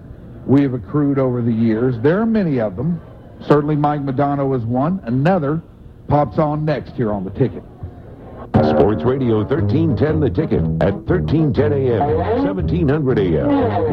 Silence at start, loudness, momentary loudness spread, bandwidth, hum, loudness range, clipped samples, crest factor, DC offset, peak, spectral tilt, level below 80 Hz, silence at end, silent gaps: 0 s; -17 LUFS; 7 LU; 5.8 kHz; none; 2 LU; under 0.1%; 16 dB; under 0.1%; 0 dBFS; -10.5 dB/octave; -36 dBFS; 0 s; none